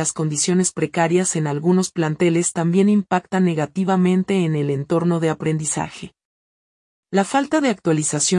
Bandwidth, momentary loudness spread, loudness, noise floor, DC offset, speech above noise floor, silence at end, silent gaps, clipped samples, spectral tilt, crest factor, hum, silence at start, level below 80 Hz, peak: 12 kHz; 5 LU; -19 LUFS; under -90 dBFS; under 0.1%; over 71 dB; 0 s; 6.25-7.03 s; under 0.1%; -5 dB/octave; 14 dB; none; 0 s; -62 dBFS; -4 dBFS